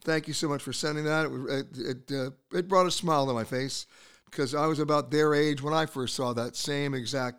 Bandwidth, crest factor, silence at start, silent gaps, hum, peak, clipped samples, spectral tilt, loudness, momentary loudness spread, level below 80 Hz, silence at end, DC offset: 16.5 kHz; 20 dB; 0 s; none; none; -10 dBFS; under 0.1%; -4.5 dB/octave; -29 LUFS; 9 LU; -64 dBFS; 0 s; 0.3%